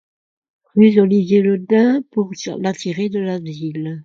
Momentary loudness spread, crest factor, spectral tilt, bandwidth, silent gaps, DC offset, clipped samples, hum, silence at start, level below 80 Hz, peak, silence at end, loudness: 13 LU; 16 dB; -7 dB/octave; 7.4 kHz; none; under 0.1%; under 0.1%; none; 0.75 s; -62 dBFS; 0 dBFS; 0 s; -17 LUFS